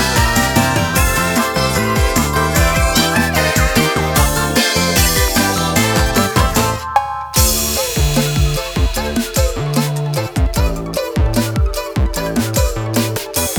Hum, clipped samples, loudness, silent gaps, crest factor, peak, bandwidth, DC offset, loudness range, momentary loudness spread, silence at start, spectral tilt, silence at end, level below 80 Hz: none; under 0.1%; -15 LUFS; none; 14 dB; 0 dBFS; over 20 kHz; under 0.1%; 4 LU; 5 LU; 0 s; -4 dB/octave; 0 s; -22 dBFS